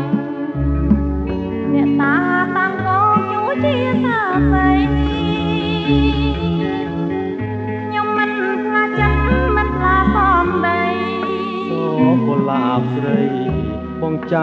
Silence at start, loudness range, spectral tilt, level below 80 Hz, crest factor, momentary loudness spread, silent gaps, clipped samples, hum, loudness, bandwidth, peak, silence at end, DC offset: 0 s; 3 LU; -8.5 dB/octave; -28 dBFS; 16 dB; 7 LU; none; under 0.1%; none; -17 LUFS; 6.4 kHz; -2 dBFS; 0 s; under 0.1%